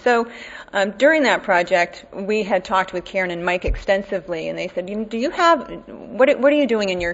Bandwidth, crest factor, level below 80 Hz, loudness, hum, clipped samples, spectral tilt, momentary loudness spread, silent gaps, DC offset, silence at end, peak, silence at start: 8 kHz; 18 dB; -38 dBFS; -19 LUFS; none; under 0.1%; -4.5 dB/octave; 11 LU; none; under 0.1%; 0 s; -2 dBFS; 0.05 s